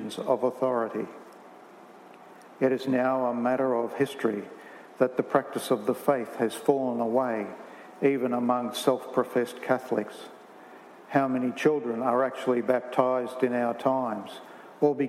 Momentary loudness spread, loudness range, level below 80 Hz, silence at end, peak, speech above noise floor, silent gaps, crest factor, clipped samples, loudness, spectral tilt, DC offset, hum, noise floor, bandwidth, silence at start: 13 LU; 2 LU; -86 dBFS; 0 s; -6 dBFS; 23 dB; none; 22 dB; under 0.1%; -27 LUFS; -6 dB/octave; under 0.1%; none; -50 dBFS; 16 kHz; 0 s